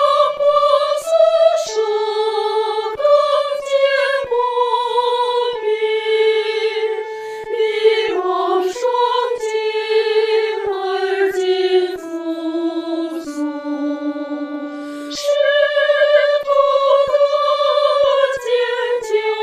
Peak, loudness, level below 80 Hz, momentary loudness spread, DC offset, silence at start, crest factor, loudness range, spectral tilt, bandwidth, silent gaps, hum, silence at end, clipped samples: -2 dBFS; -17 LUFS; -62 dBFS; 10 LU; under 0.1%; 0 s; 16 dB; 5 LU; -2 dB/octave; 13 kHz; none; none; 0 s; under 0.1%